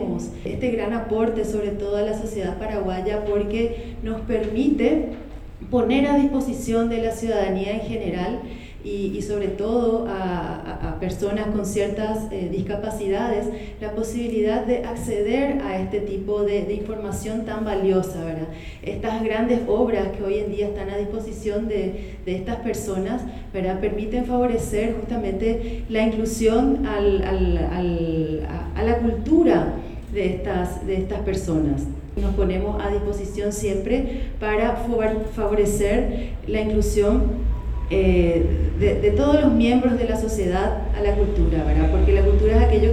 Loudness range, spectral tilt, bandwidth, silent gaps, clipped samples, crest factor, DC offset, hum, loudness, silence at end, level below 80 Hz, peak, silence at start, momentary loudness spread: 6 LU; -7 dB/octave; 14.5 kHz; none; under 0.1%; 18 dB; under 0.1%; none; -23 LUFS; 0 s; -28 dBFS; -4 dBFS; 0 s; 10 LU